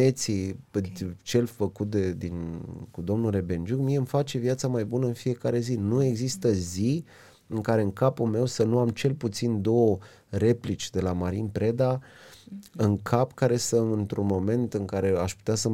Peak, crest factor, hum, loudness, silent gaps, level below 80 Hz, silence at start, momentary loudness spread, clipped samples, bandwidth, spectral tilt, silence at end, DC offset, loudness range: -8 dBFS; 18 dB; none; -27 LUFS; none; -56 dBFS; 0 s; 9 LU; under 0.1%; 16.5 kHz; -6.5 dB/octave; 0 s; under 0.1%; 3 LU